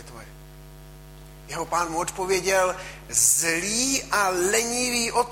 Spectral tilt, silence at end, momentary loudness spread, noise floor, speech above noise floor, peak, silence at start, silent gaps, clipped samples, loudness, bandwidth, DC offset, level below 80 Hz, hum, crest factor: -1.5 dB/octave; 0 s; 15 LU; -44 dBFS; 20 dB; -6 dBFS; 0 s; none; under 0.1%; -22 LUFS; 16.5 kHz; under 0.1%; -48 dBFS; none; 20 dB